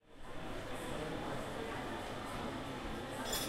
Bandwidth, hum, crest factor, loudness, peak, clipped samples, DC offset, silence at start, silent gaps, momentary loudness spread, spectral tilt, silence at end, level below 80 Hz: 16 kHz; none; 16 dB; -43 LUFS; -26 dBFS; under 0.1%; under 0.1%; 0.05 s; none; 4 LU; -4 dB/octave; 0 s; -52 dBFS